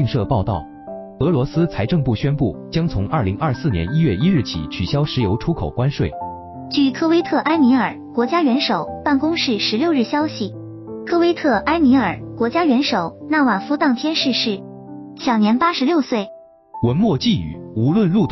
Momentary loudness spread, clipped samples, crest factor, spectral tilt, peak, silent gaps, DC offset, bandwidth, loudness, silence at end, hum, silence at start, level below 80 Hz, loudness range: 11 LU; under 0.1%; 12 dB; -5 dB/octave; -6 dBFS; none; under 0.1%; 6.2 kHz; -18 LUFS; 0 s; none; 0 s; -42 dBFS; 3 LU